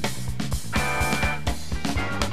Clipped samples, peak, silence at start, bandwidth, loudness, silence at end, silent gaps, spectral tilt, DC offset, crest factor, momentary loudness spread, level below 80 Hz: under 0.1%; -6 dBFS; 0 s; 15.5 kHz; -26 LUFS; 0 s; none; -4 dB/octave; 3%; 20 dB; 6 LU; -34 dBFS